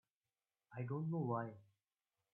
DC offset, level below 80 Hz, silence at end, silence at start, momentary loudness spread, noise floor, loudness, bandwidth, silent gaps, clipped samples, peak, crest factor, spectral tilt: under 0.1%; -86 dBFS; 0.7 s; 0.7 s; 11 LU; under -90 dBFS; -44 LUFS; 2.9 kHz; none; under 0.1%; -28 dBFS; 18 dB; -11 dB/octave